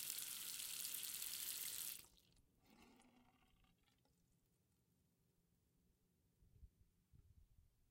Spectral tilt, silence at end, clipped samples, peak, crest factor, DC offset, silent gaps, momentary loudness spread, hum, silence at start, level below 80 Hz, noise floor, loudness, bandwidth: 1 dB/octave; 0.25 s; under 0.1%; -28 dBFS; 28 dB; under 0.1%; none; 3 LU; none; 0 s; -78 dBFS; -83 dBFS; -47 LUFS; 17 kHz